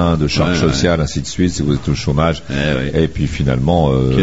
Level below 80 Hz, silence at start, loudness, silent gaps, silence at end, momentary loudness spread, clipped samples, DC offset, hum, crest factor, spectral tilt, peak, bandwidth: -28 dBFS; 0 s; -16 LUFS; none; 0 s; 4 LU; under 0.1%; 2%; none; 14 dB; -6 dB/octave; 0 dBFS; 8 kHz